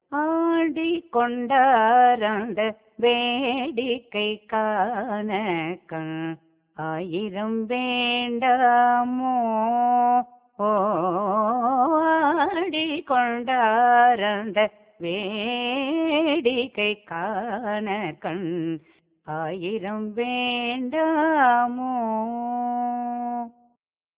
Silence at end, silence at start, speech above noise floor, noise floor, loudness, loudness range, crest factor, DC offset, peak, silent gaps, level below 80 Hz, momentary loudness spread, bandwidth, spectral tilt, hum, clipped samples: 0.7 s; 0.1 s; 48 dB; -71 dBFS; -23 LUFS; 7 LU; 16 dB; under 0.1%; -6 dBFS; none; -68 dBFS; 12 LU; 4 kHz; -8.5 dB/octave; none; under 0.1%